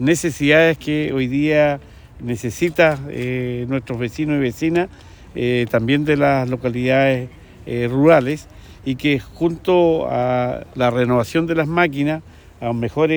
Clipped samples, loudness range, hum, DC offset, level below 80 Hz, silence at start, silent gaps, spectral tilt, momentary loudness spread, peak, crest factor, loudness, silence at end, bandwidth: under 0.1%; 3 LU; none; under 0.1%; -46 dBFS; 0 s; none; -6.5 dB/octave; 12 LU; -2 dBFS; 18 dB; -18 LUFS; 0 s; over 20 kHz